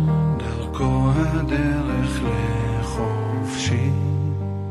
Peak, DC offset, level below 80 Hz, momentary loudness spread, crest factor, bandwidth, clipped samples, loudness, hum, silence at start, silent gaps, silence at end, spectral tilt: -8 dBFS; under 0.1%; -32 dBFS; 5 LU; 14 dB; 12 kHz; under 0.1%; -22 LUFS; none; 0 s; none; 0 s; -7 dB/octave